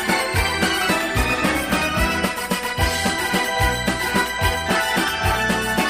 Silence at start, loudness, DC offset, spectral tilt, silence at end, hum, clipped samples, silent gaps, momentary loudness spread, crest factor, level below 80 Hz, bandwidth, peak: 0 s; -20 LUFS; 0.2%; -3.5 dB/octave; 0 s; none; under 0.1%; none; 2 LU; 14 dB; -32 dBFS; 15.5 kHz; -6 dBFS